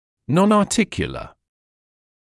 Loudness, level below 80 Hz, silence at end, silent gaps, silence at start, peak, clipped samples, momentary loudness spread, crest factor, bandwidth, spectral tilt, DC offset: -19 LUFS; -48 dBFS; 1.05 s; none; 0.3 s; -4 dBFS; under 0.1%; 12 LU; 18 dB; 12 kHz; -5.5 dB/octave; under 0.1%